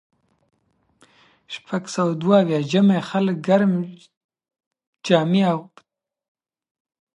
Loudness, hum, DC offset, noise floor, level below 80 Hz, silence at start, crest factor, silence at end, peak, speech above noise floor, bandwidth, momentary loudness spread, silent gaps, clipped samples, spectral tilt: -20 LUFS; none; under 0.1%; -65 dBFS; -72 dBFS; 1.5 s; 20 dB; 1.5 s; -2 dBFS; 46 dB; 10.5 kHz; 14 LU; 4.17-4.29 s, 4.67-4.71 s, 4.87-4.93 s; under 0.1%; -7 dB/octave